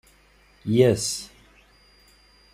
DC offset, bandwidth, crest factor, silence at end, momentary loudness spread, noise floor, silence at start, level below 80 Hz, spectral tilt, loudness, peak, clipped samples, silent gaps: under 0.1%; 15.5 kHz; 22 dB; 1.3 s; 18 LU; -57 dBFS; 0.65 s; -56 dBFS; -5 dB/octave; -22 LUFS; -4 dBFS; under 0.1%; none